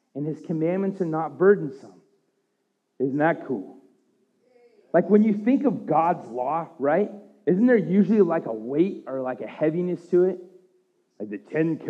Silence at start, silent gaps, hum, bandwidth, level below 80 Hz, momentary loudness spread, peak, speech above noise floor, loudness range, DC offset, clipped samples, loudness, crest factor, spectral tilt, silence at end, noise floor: 0.15 s; none; none; 6.2 kHz; under -90 dBFS; 12 LU; -6 dBFS; 51 dB; 5 LU; under 0.1%; under 0.1%; -24 LUFS; 18 dB; -10 dB/octave; 0 s; -74 dBFS